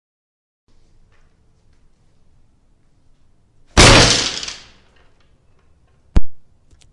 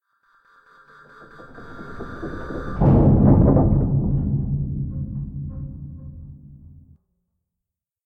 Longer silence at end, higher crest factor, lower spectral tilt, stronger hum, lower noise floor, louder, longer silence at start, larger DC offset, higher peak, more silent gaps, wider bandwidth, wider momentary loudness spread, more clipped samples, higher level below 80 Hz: second, 0.55 s vs 1.5 s; about the same, 18 dB vs 18 dB; second, -3 dB/octave vs -12 dB/octave; neither; second, -54 dBFS vs -85 dBFS; first, -12 LUFS vs -20 LUFS; first, 3.75 s vs 1.2 s; neither; first, 0 dBFS vs -4 dBFS; neither; first, 11.5 kHz vs 3.9 kHz; second, 20 LU vs 24 LU; neither; about the same, -28 dBFS vs -32 dBFS